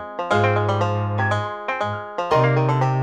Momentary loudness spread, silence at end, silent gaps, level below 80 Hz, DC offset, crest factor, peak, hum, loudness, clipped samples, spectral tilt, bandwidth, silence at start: 7 LU; 0 s; none; -56 dBFS; under 0.1%; 16 dB; -6 dBFS; none; -21 LUFS; under 0.1%; -7 dB/octave; 9 kHz; 0 s